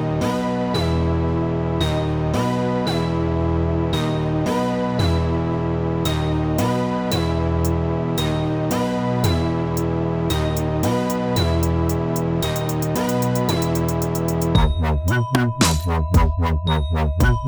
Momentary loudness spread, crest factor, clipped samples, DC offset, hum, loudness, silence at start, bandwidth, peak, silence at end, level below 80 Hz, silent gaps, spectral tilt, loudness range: 3 LU; 16 dB; under 0.1%; under 0.1%; none; -21 LUFS; 0 s; over 20 kHz; -4 dBFS; 0 s; -28 dBFS; none; -6 dB/octave; 2 LU